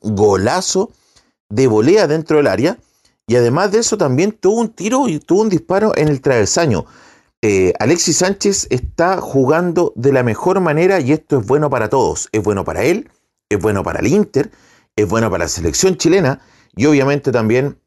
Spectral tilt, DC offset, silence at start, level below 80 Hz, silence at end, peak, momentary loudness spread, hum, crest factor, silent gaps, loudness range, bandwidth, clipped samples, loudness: -5 dB/octave; under 0.1%; 0.05 s; -42 dBFS; 0.15 s; -2 dBFS; 6 LU; none; 12 dB; 1.40-1.50 s, 7.37-7.43 s; 2 LU; 12.5 kHz; under 0.1%; -15 LUFS